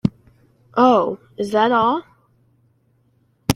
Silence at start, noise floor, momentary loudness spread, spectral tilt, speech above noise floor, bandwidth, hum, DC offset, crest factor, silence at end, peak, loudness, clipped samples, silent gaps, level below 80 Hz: 0.05 s; -61 dBFS; 12 LU; -6 dB/octave; 44 dB; 16.5 kHz; none; under 0.1%; 20 dB; 0 s; 0 dBFS; -18 LUFS; under 0.1%; none; -50 dBFS